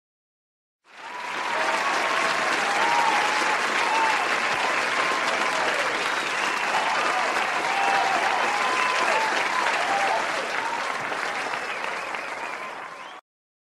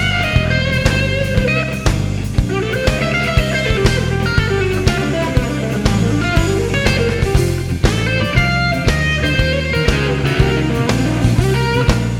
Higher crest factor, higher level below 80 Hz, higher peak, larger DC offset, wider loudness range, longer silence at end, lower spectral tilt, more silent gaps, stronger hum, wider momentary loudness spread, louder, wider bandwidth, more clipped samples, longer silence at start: about the same, 16 dB vs 14 dB; second, -72 dBFS vs -22 dBFS; second, -8 dBFS vs 0 dBFS; neither; first, 4 LU vs 1 LU; first, 0.45 s vs 0 s; second, -1 dB/octave vs -5.5 dB/octave; neither; neither; first, 10 LU vs 3 LU; second, -23 LUFS vs -16 LUFS; about the same, 15.5 kHz vs 16.5 kHz; neither; first, 0.95 s vs 0 s